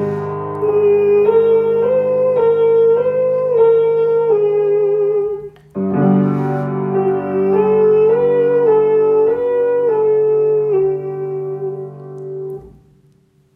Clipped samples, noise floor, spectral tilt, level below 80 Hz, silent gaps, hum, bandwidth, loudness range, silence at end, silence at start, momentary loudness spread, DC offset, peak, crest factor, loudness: under 0.1%; -53 dBFS; -10.5 dB/octave; -58 dBFS; none; none; 4 kHz; 4 LU; 0.85 s; 0 s; 12 LU; under 0.1%; -2 dBFS; 12 dB; -14 LUFS